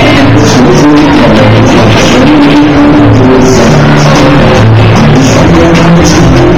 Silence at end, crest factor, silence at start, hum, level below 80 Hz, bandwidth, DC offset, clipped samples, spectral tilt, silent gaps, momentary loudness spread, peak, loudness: 0 s; 4 dB; 0 s; none; -18 dBFS; 13.5 kHz; 10%; 20%; -6 dB/octave; none; 1 LU; 0 dBFS; -3 LUFS